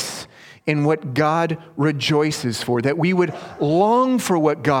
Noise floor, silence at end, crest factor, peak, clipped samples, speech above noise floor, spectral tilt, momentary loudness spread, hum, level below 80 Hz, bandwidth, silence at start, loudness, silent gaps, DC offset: -40 dBFS; 0 s; 18 dB; -2 dBFS; under 0.1%; 21 dB; -5.5 dB/octave; 8 LU; none; -58 dBFS; 17.5 kHz; 0 s; -20 LUFS; none; under 0.1%